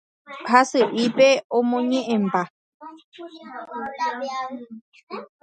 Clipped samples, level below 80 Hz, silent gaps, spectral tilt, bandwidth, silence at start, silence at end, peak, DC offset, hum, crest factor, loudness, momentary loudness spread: under 0.1%; -74 dBFS; 1.44-1.50 s, 2.50-2.80 s, 3.04-3.12 s, 4.81-4.92 s, 5.03-5.07 s; -4.5 dB/octave; 9.2 kHz; 0.3 s; 0.2 s; 0 dBFS; under 0.1%; none; 22 dB; -21 LUFS; 23 LU